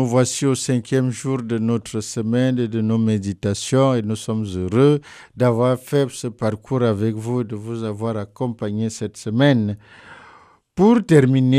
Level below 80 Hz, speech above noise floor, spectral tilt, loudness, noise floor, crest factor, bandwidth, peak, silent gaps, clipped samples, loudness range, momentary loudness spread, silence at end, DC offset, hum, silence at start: -56 dBFS; 31 dB; -6.5 dB/octave; -20 LUFS; -50 dBFS; 16 dB; 14 kHz; -2 dBFS; none; under 0.1%; 4 LU; 10 LU; 0 s; under 0.1%; none; 0 s